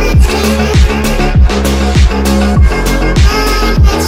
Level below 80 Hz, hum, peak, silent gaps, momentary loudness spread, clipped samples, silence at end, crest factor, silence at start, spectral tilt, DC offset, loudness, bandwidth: -10 dBFS; none; 0 dBFS; none; 2 LU; under 0.1%; 0 s; 8 dB; 0 s; -5.5 dB/octave; under 0.1%; -10 LUFS; 16.5 kHz